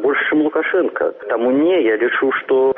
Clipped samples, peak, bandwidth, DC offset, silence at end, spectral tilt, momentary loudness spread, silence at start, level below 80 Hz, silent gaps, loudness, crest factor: under 0.1%; -8 dBFS; 3.8 kHz; under 0.1%; 0 s; -2.5 dB/octave; 5 LU; 0 s; -62 dBFS; none; -17 LUFS; 8 dB